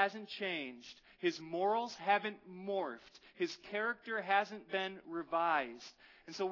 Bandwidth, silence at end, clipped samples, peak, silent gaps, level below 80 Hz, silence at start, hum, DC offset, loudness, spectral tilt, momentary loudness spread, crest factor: 6 kHz; 0 s; under 0.1%; -18 dBFS; none; -82 dBFS; 0 s; none; under 0.1%; -38 LUFS; -1.5 dB/octave; 16 LU; 20 dB